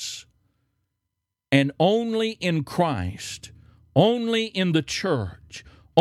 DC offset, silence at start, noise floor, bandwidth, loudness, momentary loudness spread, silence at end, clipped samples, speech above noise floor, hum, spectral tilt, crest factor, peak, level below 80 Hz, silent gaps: under 0.1%; 0 s; -82 dBFS; 15 kHz; -23 LUFS; 17 LU; 0 s; under 0.1%; 59 dB; none; -5.5 dB/octave; 20 dB; -4 dBFS; -56 dBFS; none